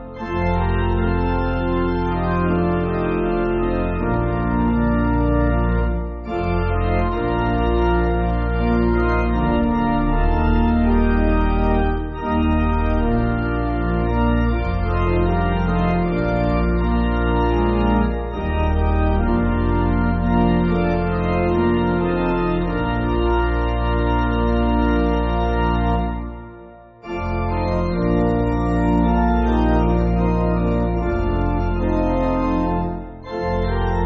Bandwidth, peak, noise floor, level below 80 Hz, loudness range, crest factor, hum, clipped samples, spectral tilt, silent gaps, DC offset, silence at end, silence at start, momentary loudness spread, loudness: 6 kHz; -6 dBFS; -41 dBFS; -24 dBFS; 2 LU; 12 dB; none; under 0.1%; -7.5 dB/octave; none; under 0.1%; 0 s; 0 s; 4 LU; -20 LUFS